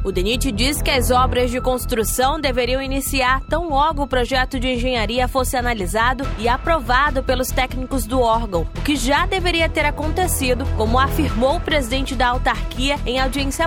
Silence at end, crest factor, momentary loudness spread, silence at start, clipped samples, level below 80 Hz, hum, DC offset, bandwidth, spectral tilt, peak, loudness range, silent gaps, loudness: 0 s; 16 dB; 4 LU; 0 s; under 0.1%; -26 dBFS; none; under 0.1%; 17.5 kHz; -4 dB/octave; -4 dBFS; 1 LU; none; -19 LUFS